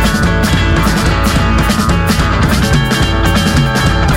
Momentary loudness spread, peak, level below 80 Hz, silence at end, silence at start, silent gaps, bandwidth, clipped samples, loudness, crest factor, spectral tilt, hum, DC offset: 1 LU; -2 dBFS; -16 dBFS; 0 s; 0 s; none; 16.5 kHz; under 0.1%; -11 LUFS; 10 dB; -5 dB/octave; none; under 0.1%